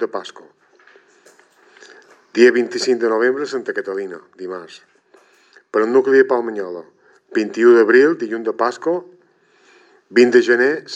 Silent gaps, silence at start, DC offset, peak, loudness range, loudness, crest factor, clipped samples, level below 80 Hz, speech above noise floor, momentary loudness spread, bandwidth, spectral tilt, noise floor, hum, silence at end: none; 0 s; under 0.1%; 0 dBFS; 5 LU; -16 LUFS; 18 dB; under 0.1%; -80 dBFS; 39 dB; 18 LU; 8.4 kHz; -4.5 dB/octave; -55 dBFS; none; 0 s